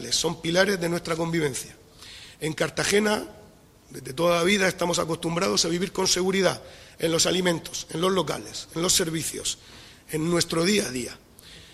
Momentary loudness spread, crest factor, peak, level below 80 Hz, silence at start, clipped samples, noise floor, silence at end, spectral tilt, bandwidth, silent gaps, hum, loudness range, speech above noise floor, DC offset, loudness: 15 LU; 22 dB; -4 dBFS; -54 dBFS; 0 s; under 0.1%; -52 dBFS; 0.05 s; -3 dB/octave; 16 kHz; none; none; 3 LU; 27 dB; under 0.1%; -24 LUFS